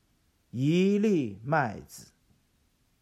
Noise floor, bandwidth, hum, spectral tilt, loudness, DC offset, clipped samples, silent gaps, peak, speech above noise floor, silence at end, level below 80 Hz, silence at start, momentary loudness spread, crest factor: -69 dBFS; 13.5 kHz; none; -7 dB/octave; -27 LUFS; under 0.1%; under 0.1%; none; -14 dBFS; 43 dB; 1 s; -68 dBFS; 0.55 s; 21 LU; 16 dB